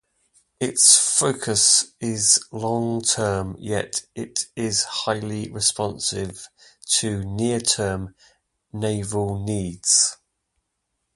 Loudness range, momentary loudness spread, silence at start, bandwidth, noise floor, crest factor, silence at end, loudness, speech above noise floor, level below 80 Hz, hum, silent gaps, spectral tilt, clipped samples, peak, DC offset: 7 LU; 14 LU; 0.6 s; 12 kHz; -77 dBFS; 24 dB; 1 s; -20 LUFS; 55 dB; -50 dBFS; none; none; -2.5 dB/octave; under 0.1%; 0 dBFS; under 0.1%